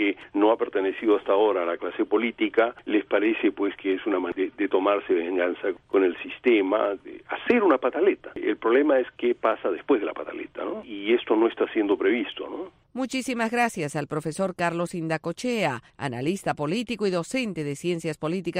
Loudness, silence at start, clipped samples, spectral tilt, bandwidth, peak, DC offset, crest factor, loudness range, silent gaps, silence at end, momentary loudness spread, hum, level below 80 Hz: -25 LUFS; 0 s; under 0.1%; -5.5 dB/octave; 14.5 kHz; -8 dBFS; under 0.1%; 18 dB; 4 LU; none; 0 s; 10 LU; none; -64 dBFS